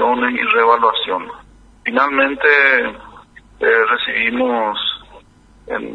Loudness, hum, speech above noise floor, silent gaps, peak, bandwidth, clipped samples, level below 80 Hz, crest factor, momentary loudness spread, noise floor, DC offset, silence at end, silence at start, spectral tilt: -15 LUFS; none; 30 dB; none; 0 dBFS; 6.4 kHz; under 0.1%; -50 dBFS; 16 dB; 14 LU; -46 dBFS; under 0.1%; 0 s; 0 s; -4.5 dB/octave